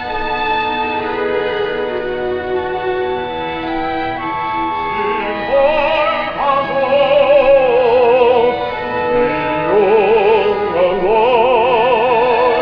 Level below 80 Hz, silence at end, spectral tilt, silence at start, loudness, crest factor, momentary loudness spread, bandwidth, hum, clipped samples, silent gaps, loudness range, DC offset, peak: -38 dBFS; 0 s; -7 dB/octave; 0 s; -14 LUFS; 14 dB; 9 LU; 5.4 kHz; none; under 0.1%; none; 7 LU; under 0.1%; 0 dBFS